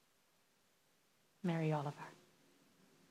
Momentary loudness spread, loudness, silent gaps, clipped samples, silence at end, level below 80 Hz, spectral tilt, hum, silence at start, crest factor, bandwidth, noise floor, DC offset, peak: 17 LU; -41 LUFS; none; under 0.1%; 0.95 s; under -90 dBFS; -7.5 dB/octave; none; 1.45 s; 20 dB; 13.5 kHz; -76 dBFS; under 0.1%; -26 dBFS